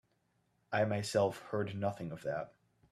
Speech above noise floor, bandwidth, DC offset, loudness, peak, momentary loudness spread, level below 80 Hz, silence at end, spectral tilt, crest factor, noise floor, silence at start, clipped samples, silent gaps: 42 dB; 13.5 kHz; under 0.1%; -36 LUFS; -18 dBFS; 9 LU; -72 dBFS; 0.45 s; -5.5 dB/octave; 18 dB; -77 dBFS; 0.7 s; under 0.1%; none